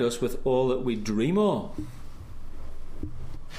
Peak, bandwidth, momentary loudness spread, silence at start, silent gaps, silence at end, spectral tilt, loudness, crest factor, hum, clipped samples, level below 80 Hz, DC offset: -12 dBFS; 15 kHz; 21 LU; 0 s; none; 0 s; -6.5 dB/octave; -27 LUFS; 16 dB; none; under 0.1%; -38 dBFS; under 0.1%